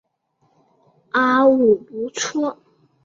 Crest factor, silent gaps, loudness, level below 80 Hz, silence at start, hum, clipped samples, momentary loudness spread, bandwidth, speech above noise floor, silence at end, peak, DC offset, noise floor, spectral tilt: 16 dB; none; -18 LUFS; -64 dBFS; 1.15 s; none; under 0.1%; 11 LU; 7.8 kHz; 48 dB; 0.5 s; -4 dBFS; under 0.1%; -66 dBFS; -3.5 dB/octave